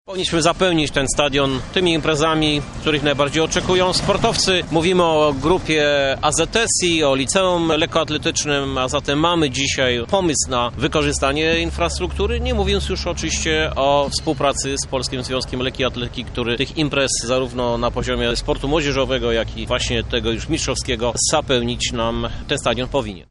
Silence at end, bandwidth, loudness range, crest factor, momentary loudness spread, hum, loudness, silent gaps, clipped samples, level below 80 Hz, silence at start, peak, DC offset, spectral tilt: 0.1 s; 11.5 kHz; 4 LU; 16 dB; 5 LU; none; -18 LUFS; none; under 0.1%; -32 dBFS; 0.1 s; -2 dBFS; under 0.1%; -3.5 dB/octave